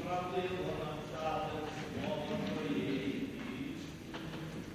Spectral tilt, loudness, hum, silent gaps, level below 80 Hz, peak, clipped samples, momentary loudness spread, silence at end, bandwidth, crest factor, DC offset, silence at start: -6 dB/octave; -39 LUFS; none; none; -58 dBFS; -24 dBFS; under 0.1%; 7 LU; 0 s; 16 kHz; 16 dB; under 0.1%; 0 s